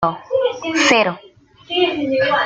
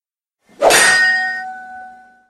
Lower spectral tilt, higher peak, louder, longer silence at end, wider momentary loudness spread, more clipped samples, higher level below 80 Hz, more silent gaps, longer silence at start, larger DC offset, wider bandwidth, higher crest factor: first, -3 dB/octave vs 0 dB/octave; about the same, -2 dBFS vs 0 dBFS; second, -17 LUFS vs -12 LUFS; second, 0 s vs 0.4 s; second, 8 LU vs 22 LU; neither; about the same, -56 dBFS vs -52 dBFS; neither; second, 0 s vs 0.6 s; neither; second, 9.2 kHz vs 16 kHz; about the same, 16 dB vs 16 dB